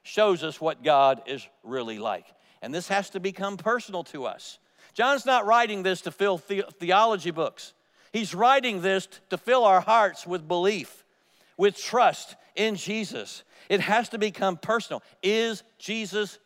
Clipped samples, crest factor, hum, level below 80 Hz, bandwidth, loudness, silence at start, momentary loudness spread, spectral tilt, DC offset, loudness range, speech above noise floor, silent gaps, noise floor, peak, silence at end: under 0.1%; 20 dB; none; -82 dBFS; 16 kHz; -25 LUFS; 0.05 s; 16 LU; -4 dB/octave; under 0.1%; 5 LU; 38 dB; none; -63 dBFS; -6 dBFS; 0.1 s